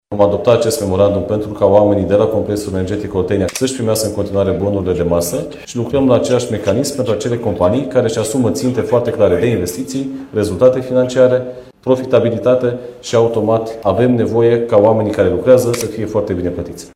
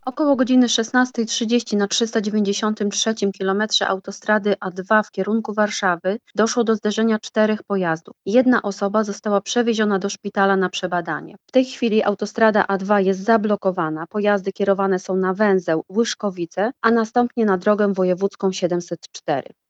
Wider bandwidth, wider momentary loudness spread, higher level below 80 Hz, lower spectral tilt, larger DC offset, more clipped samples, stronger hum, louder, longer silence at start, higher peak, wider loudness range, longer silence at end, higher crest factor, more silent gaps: first, 16 kHz vs 8.8 kHz; about the same, 8 LU vs 6 LU; first, -42 dBFS vs -72 dBFS; first, -6 dB/octave vs -4.5 dB/octave; neither; neither; neither; first, -15 LUFS vs -20 LUFS; about the same, 0.1 s vs 0.05 s; about the same, 0 dBFS vs -2 dBFS; about the same, 3 LU vs 1 LU; second, 0.1 s vs 0.3 s; about the same, 14 dB vs 18 dB; neither